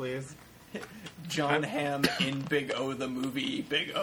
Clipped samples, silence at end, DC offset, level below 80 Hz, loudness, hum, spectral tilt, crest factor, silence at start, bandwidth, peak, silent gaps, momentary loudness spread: under 0.1%; 0 s; under 0.1%; -64 dBFS; -31 LUFS; none; -4.5 dB/octave; 22 dB; 0 s; 20 kHz; -10 dBFS; none; 16 LU